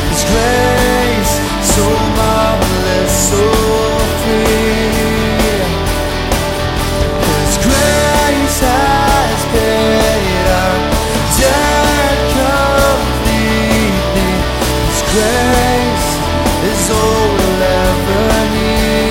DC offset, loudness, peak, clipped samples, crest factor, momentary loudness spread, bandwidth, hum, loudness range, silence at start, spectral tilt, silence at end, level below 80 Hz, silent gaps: under 0.1%; -12 LUFS; 0 dBFS; under 0.1%; 12 dB; 4 LU; 16.5 kHz; none; 2 LU; 0 s; -4 dB/octave; 0 s; -20 dBFS; none